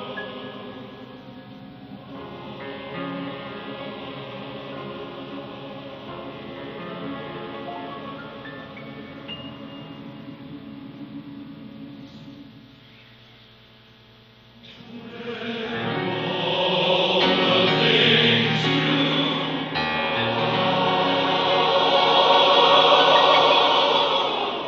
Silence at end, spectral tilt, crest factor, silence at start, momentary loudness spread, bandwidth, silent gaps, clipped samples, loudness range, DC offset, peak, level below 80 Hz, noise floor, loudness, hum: 0 s; -5 dB/octave; 20 dB; 0 s; 24 LU; 7.4 kHz; none; under 0.1%; 22 LU; under 0.1%; -4 dBFS; -60 dBFS; -51 dBFS; -19 LUFS; none